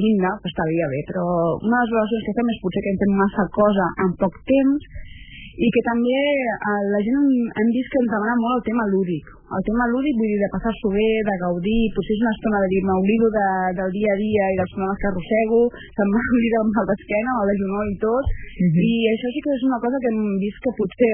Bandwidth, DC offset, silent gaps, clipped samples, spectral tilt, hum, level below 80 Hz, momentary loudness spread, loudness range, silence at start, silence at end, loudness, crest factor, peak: 3.5 kHz; under 0.1%; none; under 0.1%; -11.5 dB/octave; none; -40 dBFS; 6 LU; 1 LU; 0 s; 0 s; -21 LUFS; 14 dB; -6 dBFS